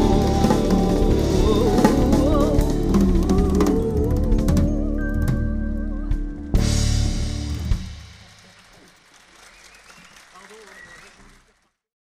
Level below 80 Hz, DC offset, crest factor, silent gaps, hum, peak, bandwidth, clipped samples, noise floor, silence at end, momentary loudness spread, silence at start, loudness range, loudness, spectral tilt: -24 dBFS; under 0.1%; 18 dB; none; none; -2 dBFS; 15.5 kHz; under 0.1%; -63 dBFS; 1.25 s; 11 LU; 0 s; 11 LU; -21 LUFS; -6.5 dB/octave